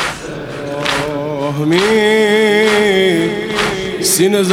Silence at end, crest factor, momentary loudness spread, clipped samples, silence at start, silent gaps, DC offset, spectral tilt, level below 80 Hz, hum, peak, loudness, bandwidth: 0 s; 14 dB; 9 LU; under 0.1%; 0 s; none; under 0.1%; -3.5 dB/octave; -44 dBFS; none; 0 dBFS; -13 LUFS; 16.5 kHz